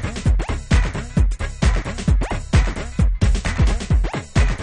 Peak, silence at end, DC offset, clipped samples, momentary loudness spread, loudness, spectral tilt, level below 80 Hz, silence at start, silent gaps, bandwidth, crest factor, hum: -4 dBFS; 0 s; under 0.1%; under 0.1%; 3 LU; -21 LUFS; -6 dB/octave; -20 dBFS; 0 s; none; 10 kHz; 14 dB; none